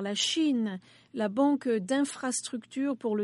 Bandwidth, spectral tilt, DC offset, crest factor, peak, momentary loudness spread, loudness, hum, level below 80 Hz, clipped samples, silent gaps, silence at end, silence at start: 11.5 kHz; -3.5 dB/octave; under 0.1%; 14 dB; -14 dBFS; 9 LU; -29 LUFS; none; -82 dBFS; under 0.1%; none; 0 s; 0 s